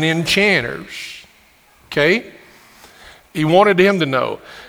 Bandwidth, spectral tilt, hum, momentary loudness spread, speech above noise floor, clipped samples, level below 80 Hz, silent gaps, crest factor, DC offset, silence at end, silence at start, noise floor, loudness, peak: over 20 kHz; -5 dB/octave; none; 17 LU; 35 dB; under 0.1%; -52 dBFS; none; 18 dB; under 0.1%; 0 s; 0 s; -51 dBFS; -15 LUFS; 0 dBFS